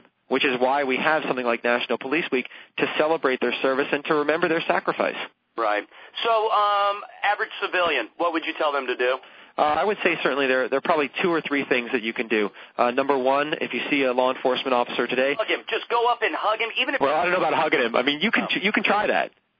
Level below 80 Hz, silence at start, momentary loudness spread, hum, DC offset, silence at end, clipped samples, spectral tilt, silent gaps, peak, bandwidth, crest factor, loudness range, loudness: -68 dBFS; 0.3 s; 5 LU; none; under 0.1%; 0.3 s; under 0.1%; -6.5 dB/octave; none; -4 dBFS; 5.4 kHz; 20 dB; 2 LU; -23 LUFS